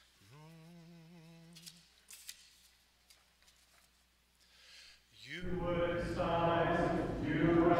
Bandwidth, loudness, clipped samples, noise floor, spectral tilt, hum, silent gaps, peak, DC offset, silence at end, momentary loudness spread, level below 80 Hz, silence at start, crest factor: 15.5 kHz; -35 LUFS; under 0.1%; -72 dBFS; -6.5 dB/octave; none; none; -18 dBFS; under 0.1%; 0 s; 26 LU; -54 dBFS; 0.35 s; 20 dB